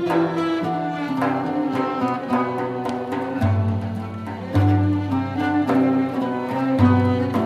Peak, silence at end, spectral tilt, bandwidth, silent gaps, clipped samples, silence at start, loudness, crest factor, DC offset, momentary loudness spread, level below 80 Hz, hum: -4 dBFS; 0 s; -8.5 dB/octave; 10.5 kHz; none; under 0.1%; 0 s; -22 LUFS; 16 dB; under 0.1%; 8 LU; -52 dBFS; none